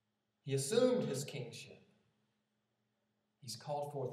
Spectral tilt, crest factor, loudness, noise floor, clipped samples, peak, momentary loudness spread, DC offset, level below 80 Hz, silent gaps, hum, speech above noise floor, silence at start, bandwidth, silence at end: -5 dB/octave; 22 dB; -37 LUFS; -84 dBFS; under 0.1%; -18 dBFS; 21 LU; under 0.1%; under -90 dBFS; none; none; 47 dB; 0.45 s; 15 kHz; 0 s